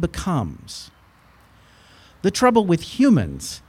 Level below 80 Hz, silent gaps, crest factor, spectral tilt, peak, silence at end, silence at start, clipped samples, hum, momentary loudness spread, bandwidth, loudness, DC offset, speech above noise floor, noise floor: -44 dBFS; none; 18 dB; -6 dB/octave; -4 dBFS; 0.1 s; 0 s; under 0.1%; none; 18 LU; 15.5 kHz; -20 LUFS; under 0.1%; 33 dB; -53 dBFS